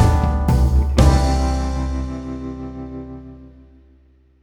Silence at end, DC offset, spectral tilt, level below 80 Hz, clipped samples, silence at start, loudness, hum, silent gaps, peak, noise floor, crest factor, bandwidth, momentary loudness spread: 0.95 s; under 0.1%; -7 dB/octave; -20 dBFS; under 0.1%; 0 s; -19 LUFS; none; none; 0 dBFS; -53 dBFS; 18 dB; 12 kHz; 18 LU